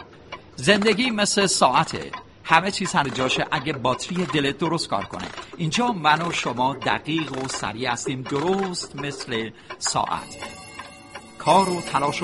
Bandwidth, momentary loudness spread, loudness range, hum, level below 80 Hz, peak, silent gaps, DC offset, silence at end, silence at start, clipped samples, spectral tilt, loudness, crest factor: 11.5 kHz; 17 LU; 6 LU; none; -54 dBFS; 0 dBFS; none; under 0.1%; 0 s; 0 s; under 0.1%; -3.5 dB/octave; -22 LUFS; 22 dB